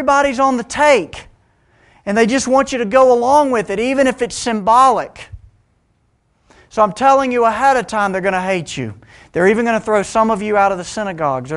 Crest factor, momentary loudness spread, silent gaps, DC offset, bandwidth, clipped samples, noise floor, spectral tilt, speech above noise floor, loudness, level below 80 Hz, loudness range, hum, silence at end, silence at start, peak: 16 dB; 12 LU; none; under 0.1%; 11.5 kHz; under 0.1%; -61 dBFS; -4.5 dB/octave; 46 dB; -15 LUFS; -46 dBFS; 3 LU; none; 0 s; 0 s; 0 dBFS